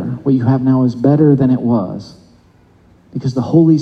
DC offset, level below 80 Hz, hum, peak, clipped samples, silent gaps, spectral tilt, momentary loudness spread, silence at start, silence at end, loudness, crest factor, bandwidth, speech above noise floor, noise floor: under 0.1%; -52 dBFS; none; 0 dBFS; under 0.1%; none; -10 dB/octave; 13 LU; 0 s; 0 s; -13 LUFS; 14 dB; 6.6 kHz; 36 dB; -48 dBFS